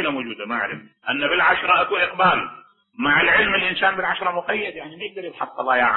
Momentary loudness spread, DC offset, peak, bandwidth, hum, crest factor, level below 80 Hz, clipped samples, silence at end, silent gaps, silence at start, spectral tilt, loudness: 14 LU; under 0.1%; -4 dBFS; 4.3 kHz; none; 16 dB; -54 dBFS; under 0.1%; 0 s; none; 0 s; -8.5 dB/octave; -19 LUFS